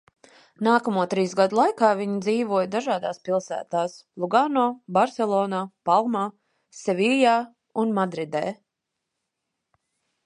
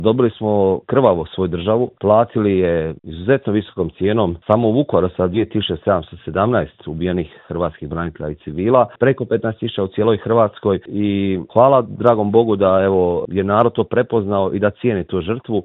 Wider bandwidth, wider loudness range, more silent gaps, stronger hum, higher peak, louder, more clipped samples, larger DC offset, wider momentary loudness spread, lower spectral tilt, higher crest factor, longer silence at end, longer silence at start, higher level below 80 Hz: first, 11 kHz vs 4.1 kHz; about the same, 3 LU vs 4 LU; neither; neither; second, -4 dBFS vs 0 dBFS; second, -24 LUFS vs -17 LUFS; neither; neither; about the same, 9 LU vs 9 LU; second, -5.5 dB/octave vs -10.5 dB/octave; about the same, 20 dB vs 16 dB; first, 1.7 s vs 0 s; first, 0.6 s vs 0 s; second, -76 dBFS vs -48 dBFS